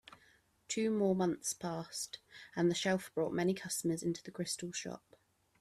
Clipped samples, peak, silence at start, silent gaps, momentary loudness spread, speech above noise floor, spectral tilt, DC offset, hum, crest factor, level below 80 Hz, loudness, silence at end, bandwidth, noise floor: under 0.1%; -20 dBFS; 0.7 s; none; 11 LU; 33 dB; -4.5 dB/octave; under 0.1%; none; 16 dB; -74 dBFS; -36 LUFS; 0.65 s; 14.5 kHz; -69 dBFS